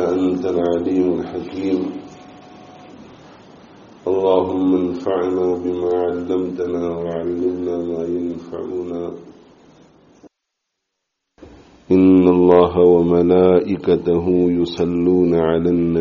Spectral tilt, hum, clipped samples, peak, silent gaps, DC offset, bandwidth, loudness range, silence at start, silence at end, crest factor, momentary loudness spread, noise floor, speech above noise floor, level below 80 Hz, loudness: -7.5 dB/octave; none; under 0.1%; 0 dBFS; none; under 0.1%; 7 kHz; 13 LU; 0 s; 0 s; 18 dB; 13 LU; -77 dBFS; 61 dB; -50 dBFS; -17 LUFS